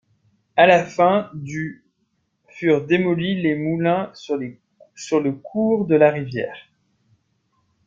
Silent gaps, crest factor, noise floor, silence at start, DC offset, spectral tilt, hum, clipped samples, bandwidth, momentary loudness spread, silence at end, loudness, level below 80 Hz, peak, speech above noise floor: none; 20 dB; -70 dBFS; 0.55 s; under 0.1%; -6.5 dB/octave; none; under 0.1%; 7.6 kHz; 14 LU; 1.25 s; -20 LUFS; -62 dBFS; -2 dBFS; 51 dB